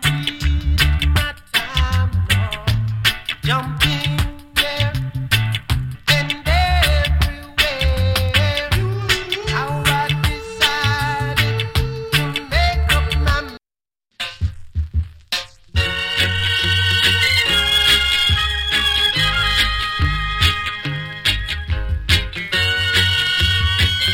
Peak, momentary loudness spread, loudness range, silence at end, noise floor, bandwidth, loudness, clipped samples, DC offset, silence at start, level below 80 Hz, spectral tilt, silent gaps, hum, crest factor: -2 dBFS; 9 LU; 6 LU; 0 s; under -90 dBFS; 17 kHz; -17 LUFS; under 0.1%; under 0.1%; 0 s; -24 dBFS; -3.5 dB/octave; none; none; 16 dB